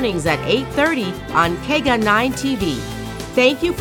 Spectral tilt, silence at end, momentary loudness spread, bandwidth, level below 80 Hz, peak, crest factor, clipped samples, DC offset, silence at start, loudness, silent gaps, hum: -4.5 dB/octave; 0 s; 7 LU; 19 kHz; -38 dBFS; -2 dBFS; 16 dB; under 0.1%; under 0.1%; 0 s; -18 LUFS; none; none